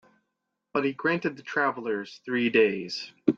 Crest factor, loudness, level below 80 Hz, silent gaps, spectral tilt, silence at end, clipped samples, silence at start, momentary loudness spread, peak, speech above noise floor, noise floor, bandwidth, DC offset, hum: 22 dB; -27 LUFS; -72 dBFS; none; -5.5 dB/octave; 0 s; under 0.1%; 0.75 s; 10 LU; -6 dBFS; 55 dB; -82 dBFS; 7.4 kHz; under 0.1%; none